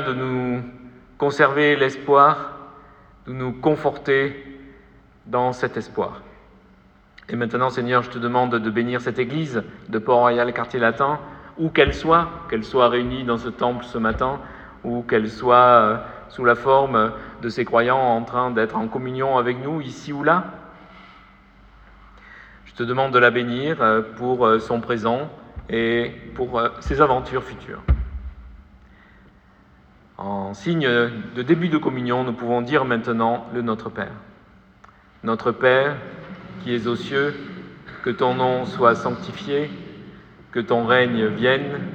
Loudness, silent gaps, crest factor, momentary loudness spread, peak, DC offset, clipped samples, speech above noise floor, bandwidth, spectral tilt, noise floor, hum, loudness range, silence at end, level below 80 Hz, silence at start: -21 LUFS; none; 22 dB; 15 LU; 0 dBFS; under 0.1%; under 0.1%; 32 dB; 8.4 kHz; -7 dB/octave; -52 dBFS; none; 6 LU; 0 s; -40 dBFS; 0 s